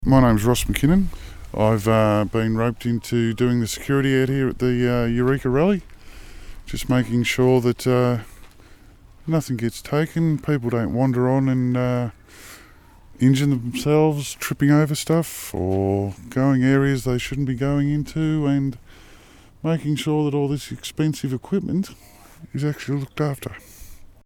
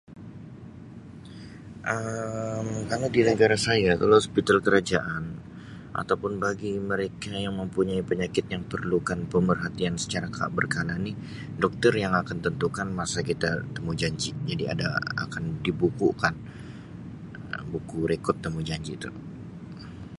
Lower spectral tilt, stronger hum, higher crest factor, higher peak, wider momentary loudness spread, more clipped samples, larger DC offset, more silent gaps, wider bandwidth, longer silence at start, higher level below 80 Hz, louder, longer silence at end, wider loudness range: about the same, -6.5 dB/octave vs -5.5 dB/octave; neither; about the same, 20 dB vs 22 dB; about the same, -2 dBFS vs -4 dBFS; second, 10 LU vs 20 LU; neither; neither; neither; first, 19 kHz vs 11.5 kHz; about the same, 0 s vs 0.1 s; first, -38 dBFS vs -50 dBFS; first, -21 LUFS vs -27 LUFS; first, 0.2 s vs 0 s; second, 4 LU vs 7 LU